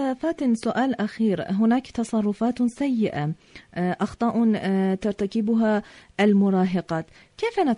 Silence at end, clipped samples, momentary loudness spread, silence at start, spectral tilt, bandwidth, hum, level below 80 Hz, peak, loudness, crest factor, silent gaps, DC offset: 0 s; under 0.1%; 9 LU; 0 s; -7.5 dB/octave; 10.5 kHz; none; -56 dBFS; -8 dBFS; -24 LUFS; 16 dB; none; under 0.1%